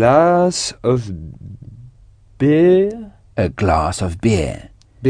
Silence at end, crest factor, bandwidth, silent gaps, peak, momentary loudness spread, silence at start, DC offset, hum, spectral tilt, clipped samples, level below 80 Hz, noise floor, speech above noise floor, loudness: 0 s; 16 dB; 10 kHz; none; 0 dBFS; 21 LU; 0 s; under 0.1%; none; -6 dB/octave; under 0.1%; -36 dBFS; -46 dBFS; 31 dB; -16 LUFS